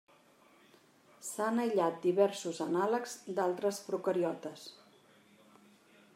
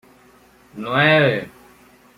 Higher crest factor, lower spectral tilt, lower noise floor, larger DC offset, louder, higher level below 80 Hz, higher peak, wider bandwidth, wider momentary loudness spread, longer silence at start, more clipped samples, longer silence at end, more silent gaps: about the same, 20 dB vs 18 dB; second, -5 dB/octave vs -6.5 dB/octave; first, -64 dBFS vs -51 dBFS; neither; second, -33 LUFS vs -17 LUFS; second, -90 dBFS vs -58 dBFS; second, -16 dBFS vs -4 dBFS; about the same, 16 kHz vs 15.5 kHz; second, 14 LU vs 19 LU; first, 1.2 s vs 0.75 s; neither; first, 1.45 s vs 0.7 s; neither